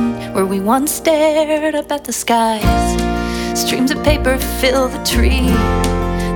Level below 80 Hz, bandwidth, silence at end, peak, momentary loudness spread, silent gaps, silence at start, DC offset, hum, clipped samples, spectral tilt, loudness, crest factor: -22 dBFS; 20 kHz; 0 s; 0 dBFS; 5 LU; none; 0 s; under 0.1%; none; under 0.1%; -4.5 dB/octave; -15 LUFS; 14 dB